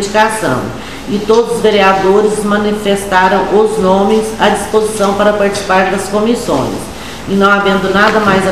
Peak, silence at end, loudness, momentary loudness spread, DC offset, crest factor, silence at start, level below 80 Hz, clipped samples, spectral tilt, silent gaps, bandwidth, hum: 0 dBFS; 0 s; -11 LUFS; 9 LU; 2%; 12 dB; 0 s; -36 dBFS; 0.2%; -4.5 dB/octave; none; 15 kHz; none